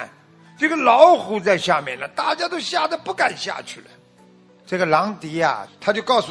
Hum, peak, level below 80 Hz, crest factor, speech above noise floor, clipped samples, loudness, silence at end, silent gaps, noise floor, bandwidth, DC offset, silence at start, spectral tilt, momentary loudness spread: none; 0 dBFS; -68 dBFS; 20 dB; 32 dB; under 0.1%; -19 LUFS; 0 s; none; -51 dBFS; 11 kHz; under 0.1%; 0 s; -4 dB/octave; 15 LU